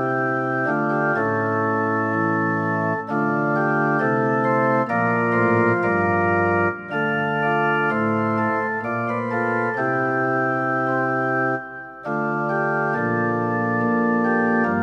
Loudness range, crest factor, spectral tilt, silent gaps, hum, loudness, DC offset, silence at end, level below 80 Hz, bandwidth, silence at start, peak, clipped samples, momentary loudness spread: 3 LU; 14 dB; -8.5 dB/octave; none; none; -21 LUFS; under 0.1%; 0 s; -62 dBFS; 7.4 kHz; 0 s; -8 dBFS; under 0.1%; 4 LU